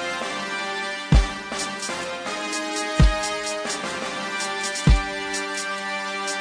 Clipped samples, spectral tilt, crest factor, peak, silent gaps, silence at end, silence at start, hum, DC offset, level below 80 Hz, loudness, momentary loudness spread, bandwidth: under 0.1%; -4 dB/octave; 20 dB; -4 dBFS; none; 0 s; 0 s; none; under 0.1%; -28 dBFS; -25 LUFS; 8 LU; 10.5 kHz